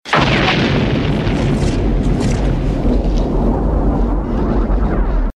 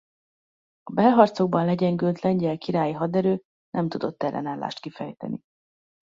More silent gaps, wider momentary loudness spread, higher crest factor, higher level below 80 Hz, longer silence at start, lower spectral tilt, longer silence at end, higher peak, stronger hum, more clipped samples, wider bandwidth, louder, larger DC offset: second, none vs 3.45-3.72 s; second, 5 LU vs 15 LU; second, 14 dB vs 22 dB; first, -18 dBFS vs -66 dBFS; second, 0.05 s vs 0.85 s; second, -6.5 dB/octave vs -8.5 dB/octave; second, 0.05 s vs 0.75 s; about the same, 0 dBFS vs -2 dBFS; neither; neither; first, 9.6 kHz vs 7.6 kHz; first, -16 LUFS vs -24 LUFS; neither